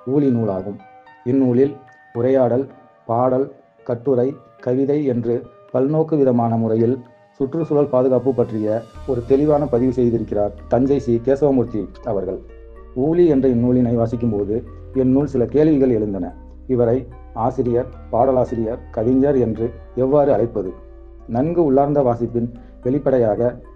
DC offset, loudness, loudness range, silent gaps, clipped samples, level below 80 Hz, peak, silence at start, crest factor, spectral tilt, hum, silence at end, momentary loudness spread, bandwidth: under 0.1%; -19 LUFS; 2 LU; none; under 0.1%; -40 dBFS; -4 dBFS; 0.05 s; 16 dB; -10.5 dB/octave; none; 0 s; 11 LU; 6.8 kHz